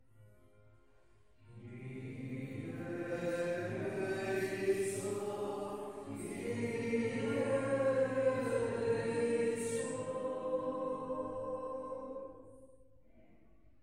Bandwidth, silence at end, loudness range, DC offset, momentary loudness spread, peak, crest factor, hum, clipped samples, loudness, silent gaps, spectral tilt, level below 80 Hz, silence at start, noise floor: 16 kHz; 0.6 s; 8 LU; under 0.1%; 12 LU; -20 dBFS; 18 dB; none; under 0.1%; -37 LUFS; none; -5.5 dB/octave; -68 dBFS; 0.2 s; -68 dBFS